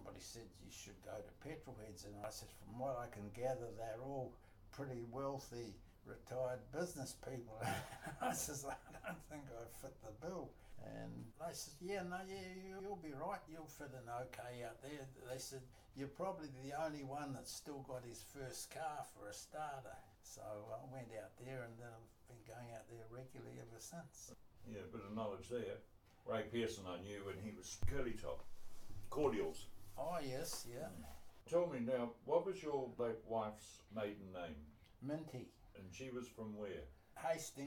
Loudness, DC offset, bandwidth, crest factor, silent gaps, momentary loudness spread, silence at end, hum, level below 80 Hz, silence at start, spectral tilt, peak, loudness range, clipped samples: -48 LUFS; under 0.1%; 19 kHz; 22 dB; none; 14 LU; 0 s; none; -64 dBFS; 0 s; -4.5 dB/octave; -24 dBFS; 9 LU; under 0.1%